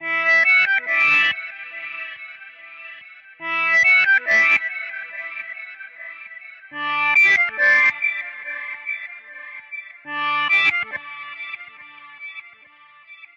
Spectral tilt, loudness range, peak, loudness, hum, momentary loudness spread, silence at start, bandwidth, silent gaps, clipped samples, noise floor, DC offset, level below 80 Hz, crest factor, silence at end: -1 dB/octave; 5 LU; -6 dBFS; -16 LUFS; none; 23 LU; 0 s; 12.5 kHz; none; under 0.1%; -49 dBFS; under 0.1%; -72 dBFS; 16 dB; 0.1 s